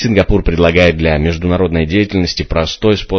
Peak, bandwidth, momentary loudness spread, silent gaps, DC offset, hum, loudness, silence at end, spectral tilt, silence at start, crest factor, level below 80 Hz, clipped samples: 0 dBFS; 8 kHz; 6 LU; none; under 0.1%; none; -13 LUFS; 0 s; -6.5 dB/octave; 0 s; 12 dB; -22 dBFS; 0.1%